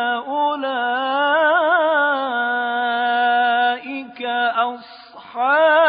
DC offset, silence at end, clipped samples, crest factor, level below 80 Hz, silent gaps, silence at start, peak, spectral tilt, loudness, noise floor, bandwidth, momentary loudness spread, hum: under 0.1%; 0 s; under 0.1%; 14 dB; -70 dBFS; none; 0 s; -4 dBFS; -7 dB/octave; -18 LUFS; -40 dBFS; 5.2 kHz; 9 LU; none